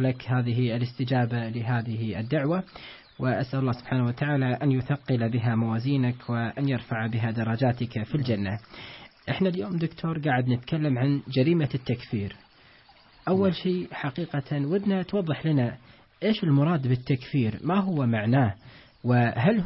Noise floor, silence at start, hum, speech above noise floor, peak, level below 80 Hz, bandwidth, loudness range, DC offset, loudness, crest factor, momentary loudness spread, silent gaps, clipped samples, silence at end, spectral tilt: -55 dBFS; 0 s; none; 30 dB; -10 dBFS; -58 dBFS; 5.8 kHz; 3 LU; under 0.1%; -27 LUFS; 16 dB; 8 LU; none; under 0.1%; 0 s; -11.5 dB/octave